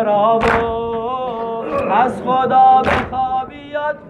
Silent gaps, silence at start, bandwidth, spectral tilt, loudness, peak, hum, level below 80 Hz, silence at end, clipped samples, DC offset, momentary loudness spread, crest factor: none; 0 s; 10.5 kHz; -6.5 dB/octave; -16 LUFS; -4 dBFS; none; -40 dBFS; 0 s; under 0.1%; under 0.1%; 12 LU; 12 dB